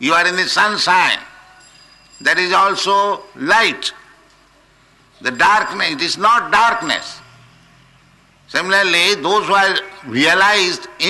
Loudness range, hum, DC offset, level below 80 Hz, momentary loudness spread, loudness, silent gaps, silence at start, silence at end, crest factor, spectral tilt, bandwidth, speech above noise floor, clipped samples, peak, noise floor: 2 LU; none; under 0.1%; -56 dBFS; 10 LU; -14 LUFS; none; 0 s; 0 s; 14 dB; -2 dB/octave; 12 kHz; 36 dB; under 0.1%; -4 dBFS; -51 dBFS